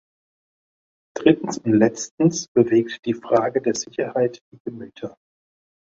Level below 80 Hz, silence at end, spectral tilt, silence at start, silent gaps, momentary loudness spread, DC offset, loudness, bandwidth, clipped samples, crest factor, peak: -64 dBFS; 0.75 s; -5.5 dB/octave; 1.15 s; 2.11-2.18 s, 2.48-2.55 s, 2.99-3.03 s, 4.41-4.52 s, 4.60-4.65 s; 17 LU; under 0.1%; -21 LUFS; 7.8 kHz; under 0.1%; 20 dB; -2 dBFS